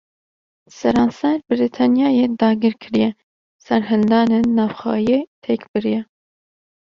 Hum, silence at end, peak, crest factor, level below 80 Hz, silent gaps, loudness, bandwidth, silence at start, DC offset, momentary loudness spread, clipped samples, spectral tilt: none; 0.85 s; -2 dBFS; 16 dB; -54 dBFS; 3.23-3.59 s, 5.27-5.42 s, 5.68-5.74 s; -18 LUFS; 7 kHz; 0.75 s; under 0.1%; 7 LU; under 0.1%; -7 dB/octave